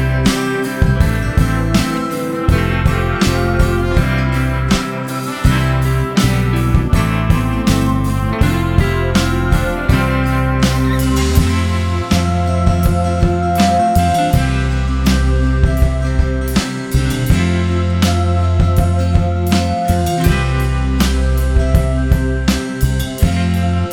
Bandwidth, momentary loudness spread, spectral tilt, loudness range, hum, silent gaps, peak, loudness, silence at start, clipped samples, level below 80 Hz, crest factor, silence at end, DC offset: 18 kHz; 3 LU; -6 dB/octave; 1 LU; none; none; 0 dBFS; -15 LUFS; 0 s; under 0.1%; -20 dBFS; 14 dB; 0 s; under 0.1%